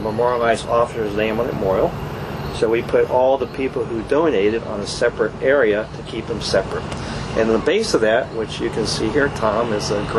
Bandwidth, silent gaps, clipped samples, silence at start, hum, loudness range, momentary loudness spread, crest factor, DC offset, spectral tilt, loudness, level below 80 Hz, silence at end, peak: 13 kHz; none; under 0.1%; 0 s; none; 1 LU; 9 LU; 16 dB; under 0.1%; -5 dB/octave; -19 LUFS; -40 dBFS; 0 s; -2 dBFS